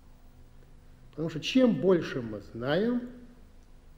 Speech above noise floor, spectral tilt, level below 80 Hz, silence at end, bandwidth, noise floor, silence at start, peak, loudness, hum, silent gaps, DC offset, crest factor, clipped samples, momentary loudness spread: 25 dB; -6.5 dB/octave; -54 dBFS; 0.05 s; 8.6 kHz; -52 dBFS; 0.1 s; -12 dBFS; -28 LUFS; none; none; under 0.1%; 18 dB; under 0.1%; 15 LU